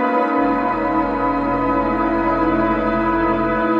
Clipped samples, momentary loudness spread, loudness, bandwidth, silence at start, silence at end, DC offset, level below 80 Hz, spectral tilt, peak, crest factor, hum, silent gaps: under 0.1%; 2 LU; -18 LUFS; 5.4 kHz; 0 s; 0 s; under 0.1%; -36 dBFS; -8.5 dB/octave; -8 dBFS; 10 dB; none; none